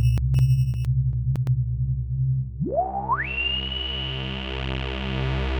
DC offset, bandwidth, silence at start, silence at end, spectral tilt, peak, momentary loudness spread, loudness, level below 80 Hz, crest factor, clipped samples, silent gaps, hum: under 0.1%; 8.8 kHz; 0 s; 0 s; -7 dB/octave; -10 dBFS; 7 LU; -25 LUFS; -32 dBFS; 12 dB; under 0.1%; none; none